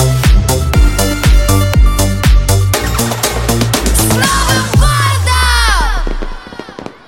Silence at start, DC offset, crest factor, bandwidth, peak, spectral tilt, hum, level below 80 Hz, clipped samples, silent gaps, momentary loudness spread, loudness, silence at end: 0 s; under 0.1%; 10 dB; 17 kHz; 0 dBFS; -4 dB/octave; none; -14 dBFS; under 0.1%; none; 11 LU; -11 LUFS; 0.15 s